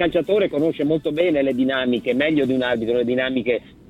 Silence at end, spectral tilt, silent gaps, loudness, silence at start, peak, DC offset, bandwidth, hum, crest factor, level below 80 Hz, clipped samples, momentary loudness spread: 0.3 s; -7 dB/octave; none; -20 LUFS; 0 s; -6 dBFS; under 0.1%; 10 kHz; none; 14 dB; -52 dBFS; under 0.1%; 2 LU